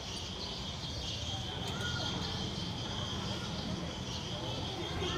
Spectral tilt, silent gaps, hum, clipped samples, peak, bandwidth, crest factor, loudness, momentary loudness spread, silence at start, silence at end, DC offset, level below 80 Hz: -4 dB/octave; none; none; under 0.1%; -24 dBFS; 15.5 kHz; 14 dB; -37 LUFS; 4 LU; 0 s; 0 s; under 0.1%; -52 dBFS